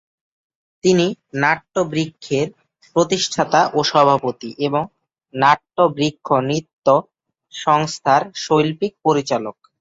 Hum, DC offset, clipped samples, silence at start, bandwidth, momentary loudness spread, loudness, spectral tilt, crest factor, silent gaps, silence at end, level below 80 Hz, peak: none; under 0.1%; under 0.1%; 0.85 s; 8 kHz; 8 LU; -18 LUFS; -4.5 dB/octave; 18 dB; 6.73-6.82 s; 0.3 s; -60 dBFS; -2 dBFS